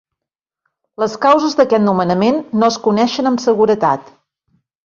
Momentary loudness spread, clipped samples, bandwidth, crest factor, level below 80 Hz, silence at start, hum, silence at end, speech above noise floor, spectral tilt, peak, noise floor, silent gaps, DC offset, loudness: 5 LU; under 0.1%; 7.4 kHz; 14 dB; -58 dBFS; 1 s; none; 0.85 s; 71 dB; -5.5 dB/octave; -2 dBFS; -84 dBFS; none; under 0.1%; -14 LUFS